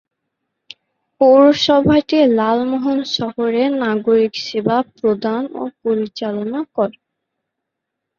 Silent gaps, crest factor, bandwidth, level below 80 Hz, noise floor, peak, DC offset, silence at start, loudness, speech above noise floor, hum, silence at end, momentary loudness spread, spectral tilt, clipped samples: none; 16 dB; 7.2 kHz; -54 dBFS; -79 dBFS; 0 dBFS; under 0.1%; 1.2 s; -16 LUFS; 63 dB; none; 1.25 s; 11 LU; -6 dB/octave; under 0.1%